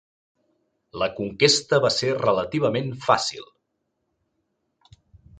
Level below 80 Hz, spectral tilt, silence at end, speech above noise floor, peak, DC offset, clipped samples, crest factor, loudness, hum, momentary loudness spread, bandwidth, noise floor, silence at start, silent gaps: -58 dBFS; -3.5 dB/octave; 1.95 s; 54 dB; -2 dBFS; under 0.1%; under 0.1%; 22 dB; -22 LUFS; none; 10 LU; 9.6 kHz; -76 dBFS; 0.95 s; none